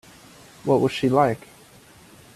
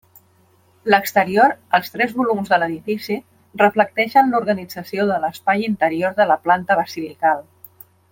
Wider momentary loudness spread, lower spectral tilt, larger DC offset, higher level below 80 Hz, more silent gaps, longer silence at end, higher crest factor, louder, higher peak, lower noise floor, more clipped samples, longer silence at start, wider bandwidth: first, 13 LU vs 10 LU; about the same, -6.5 dB/octave vs -5.5 dB/octave; neither; about the same, -60 dBFS vs -64 dBFS; neither; first, 1 s vs 0.7 s; about the same, 20 dB vs 18 dB; second, -22 LUFS vs -18 LUFS; about the same, -4 dBFS vs -2 dBFS; second, -50 dBFS vs -56 dBFS; neither; second, 0.65 s vs 0.85 s; second, 14 kHz vs 17 kHz